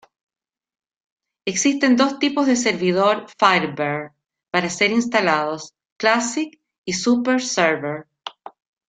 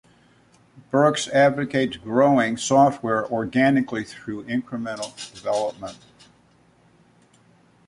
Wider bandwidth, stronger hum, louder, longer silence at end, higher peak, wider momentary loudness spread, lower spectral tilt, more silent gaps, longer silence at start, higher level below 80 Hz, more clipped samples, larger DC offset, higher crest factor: second, 9.4 kHz vs 11.5 kHz; neither; first, -19 LUFS vs -22 LUFS; second, 0.4 s vs 1.95 s; about the same, -2 dBFS vs -4 dBFS; about the same, 15 LU vs 14 LU; second, -3.5 dB/octave vs -5 dB/octave; first, 5.92-5.96 s, 6.78-6.84 s vs none; first, 1.45 s vs 0.95 s; about the same, -66 dBFS vs -62 dBFS; neither; neither; about the same, 20 dB vs 18 dB